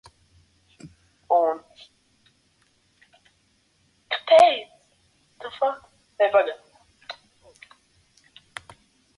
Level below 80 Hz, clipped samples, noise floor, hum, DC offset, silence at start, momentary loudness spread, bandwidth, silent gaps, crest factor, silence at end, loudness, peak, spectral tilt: -68 dBFS; under 0.1%; -66 dBFS; none; under 0.1%; 0.85 s; 26 LU; 11.5 kHz; none; 22 dB; 2.05 s; -21 LUFS; -4 dBFS; -3 dB/octave